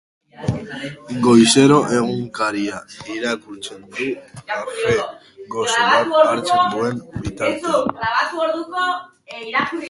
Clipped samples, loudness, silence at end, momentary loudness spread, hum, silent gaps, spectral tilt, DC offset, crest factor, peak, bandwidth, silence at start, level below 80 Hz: under 0.1%; -18 LUFS; 0 s; 17 LU; none; none; -4.5 dB/octave; under 0.1%; 18 dB; 0 dBFS; 11.5 kHz; 0.4 s; -50 dBFS